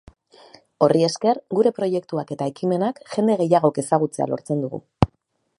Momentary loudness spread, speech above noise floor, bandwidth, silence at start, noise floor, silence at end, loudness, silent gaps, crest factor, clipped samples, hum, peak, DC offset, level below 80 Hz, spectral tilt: 8 LU; 45 dB; 11.5 kHz; 0.8 s; -66 dBFS; 0.55 s; -22 LUFS; none; 22 dB; under 0.1%; none; 0 dBFS; under 0.1%; -46 dBFS; -6.5 dB/octave